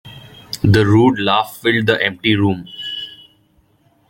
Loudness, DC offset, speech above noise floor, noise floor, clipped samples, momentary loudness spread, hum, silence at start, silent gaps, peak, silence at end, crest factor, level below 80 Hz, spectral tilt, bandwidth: -15 LUFS; under 0.1%; 42 dB; -57 dBFS; under 0.1%; 14 LU; none; 0.05 s; none; 0 dBFS; 0.95 s; 16 dB; -46 dBFS; -6.5 dB/octave; 17 kHz